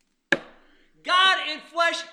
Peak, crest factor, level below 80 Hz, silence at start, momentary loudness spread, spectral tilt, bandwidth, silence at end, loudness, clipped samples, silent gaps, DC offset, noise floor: -4 dBFS; 22 dB; -66 dBFS; 0.3 s; 10 LU; -1 dB/octave; 13 kHz; 0 s; -22 LUFS; under 0.1%; none; under 0.1%; -57 dBFS